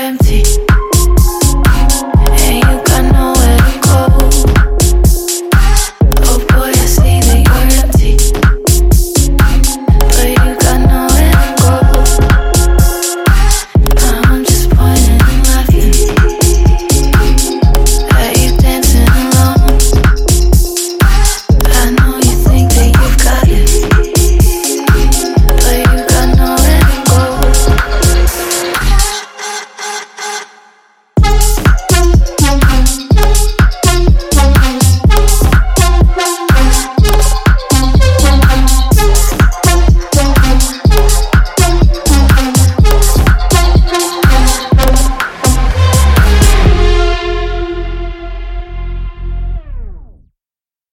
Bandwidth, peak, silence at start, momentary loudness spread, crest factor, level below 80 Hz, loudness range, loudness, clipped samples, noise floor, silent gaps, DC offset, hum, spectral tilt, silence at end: 16.5 kHz; 0 dBFS; 0 s; 5 LU; 8 dB; -10 dBFS; 3 LU; -10 LUFS; 2%; under -90 dBFS; none; under 0.1%; none; -4.5 dB/octave; 0.9 s